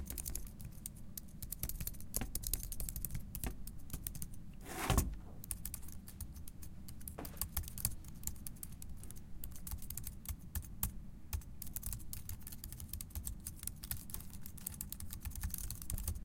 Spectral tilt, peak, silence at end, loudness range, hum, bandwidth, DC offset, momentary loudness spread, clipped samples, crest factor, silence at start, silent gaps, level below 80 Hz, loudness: -3.5 dB/octave; -14 dBFS; 0 s; 4 LU; none; 17 kHz; under 0.1%; 10 LU; under 0.1%; 28 dB; 0 s; none; -48 dBFS; -44 LUFS